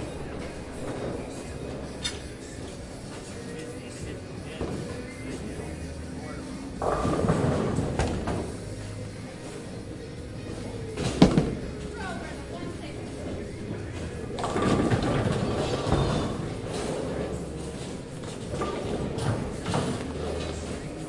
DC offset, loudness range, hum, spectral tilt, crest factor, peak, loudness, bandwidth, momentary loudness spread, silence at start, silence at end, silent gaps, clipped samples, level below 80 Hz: under 0.1%; 9 LU; none; -6 dB/octave; 26 dB; -4 dBFS; -31 LUFS; 11.5 kHz; 13 LU; 0 s; 0 s; none; under 0.1%; -42 dBFS